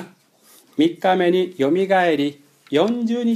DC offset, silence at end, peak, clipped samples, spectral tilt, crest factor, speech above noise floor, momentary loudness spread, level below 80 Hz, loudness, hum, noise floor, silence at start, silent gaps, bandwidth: under 0.1%; 0 s; -4 dBFS; under 0.1%; -6 dB/octave; 16 dB; 35 dB; 6 LU; -74 dBFS; -19 LUFS; none; -53 dBFS; 0 s; none; 14 kHz